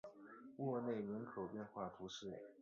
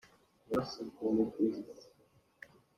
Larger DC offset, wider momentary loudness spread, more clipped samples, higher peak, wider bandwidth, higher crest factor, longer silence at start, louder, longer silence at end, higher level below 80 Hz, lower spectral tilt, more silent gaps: neither; second, 14 LU vs 23 LU; neither; second, -32 dBFS vs -18 dBFS; second, 7.4 kHz vs 13.5 kHz; about the same, 16 dB vs 18 dB; second, 0.05 s vs 0.5 s; second, -47 LUFS vs -36 LUFS; second, 0 s vs 0.95 s; second, -80 dBFS vs -70 dBFS; second, -5.5 dB/octave vs -7 dB/octave; neither